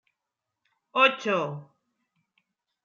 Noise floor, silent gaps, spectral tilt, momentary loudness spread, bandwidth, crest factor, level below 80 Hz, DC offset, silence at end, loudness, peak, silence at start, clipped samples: -86 dBFS; none; -4.5 dB/octave; 14 LU; 7.4 kHz; 24 dB; -86 dBFS; under 0.1%; 1.2 s; -24 LUFS; -6 dBFS; 0.95 s; under 0.1%